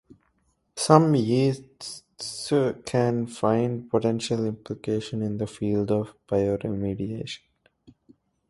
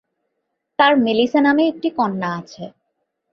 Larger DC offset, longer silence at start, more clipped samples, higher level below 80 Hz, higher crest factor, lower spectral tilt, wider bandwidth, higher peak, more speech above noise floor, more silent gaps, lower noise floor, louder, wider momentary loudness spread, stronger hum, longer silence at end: neither; about the same, 0.75 s vs 0.8 s; neither; first, -56 dBFS vs -64 dBFS; first, 24 dB vs 18 dB; about the same, -6.5 dB/octave vs -6 dB/octave; first, 11.5 kHz vs 6.6 kHz; about the same, -2 dBFS vs -2 dBFS; second, 46 dB vs 58 dB; neither; second, -70 dBFS vs -75 dBFS; second, -25 LUFS vs -17 LUFS; second, 15 LU vs 20 LU; neither; first, 1.1 s vs 0.65 s